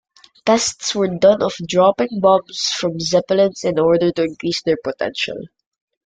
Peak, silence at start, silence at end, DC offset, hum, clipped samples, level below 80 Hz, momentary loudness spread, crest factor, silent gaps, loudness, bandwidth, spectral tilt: -2 dBFS; 0.45 s; 0.65 s; under 0.1%; none; under 0.1%; -56 dBFS; 7 LU; 16 dB; none; -17 LUFS; 9.4 kHz; -4 dB/octave